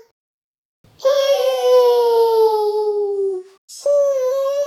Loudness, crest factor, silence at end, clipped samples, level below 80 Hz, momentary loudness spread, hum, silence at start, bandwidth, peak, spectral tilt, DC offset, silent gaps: -16 LUFS; 12 dB; 0 s; under 0.1%; -72 dBFS; 9 LU; none; 1 s; 15.5 kHz; -4 dBFS; -1.5 dB/octave; under 0.1%; 3.58-3.68 s